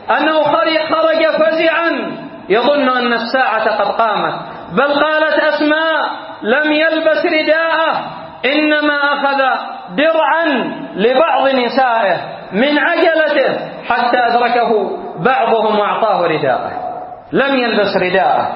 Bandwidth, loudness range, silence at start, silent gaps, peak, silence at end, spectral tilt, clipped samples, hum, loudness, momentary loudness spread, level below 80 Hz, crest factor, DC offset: 5.8 kHz; 1 LU; 0 s; none; 0 dBFS; 0 s; -8.5 dB/octave; under 0.1%; none; -14 LUFS; 8 LU; -58 dBFS; 14 dB; under 0.1%